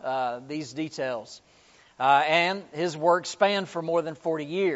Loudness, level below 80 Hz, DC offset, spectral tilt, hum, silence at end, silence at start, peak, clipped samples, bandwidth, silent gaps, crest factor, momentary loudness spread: -26 LUFS; -74 dBFS; under 0.1%; -2.5 dB/octave; none; 0 s; 0.05 s; -6 dBFS; under 0.1%; 8 kHz; none; 20 dB; 12 LU